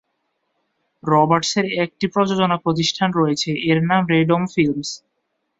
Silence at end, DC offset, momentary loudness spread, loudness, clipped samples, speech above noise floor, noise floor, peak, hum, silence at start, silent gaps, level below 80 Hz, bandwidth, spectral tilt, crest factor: 0.6 s; under 0.1%; 5 LU; -18 LUFS; under 0.1%; 55 dB; -73 dBFS; -2 dBFS; none; 1.05 s; none; -58 dBFS; 7.8 kHz; -5 dB/octave; 18 dB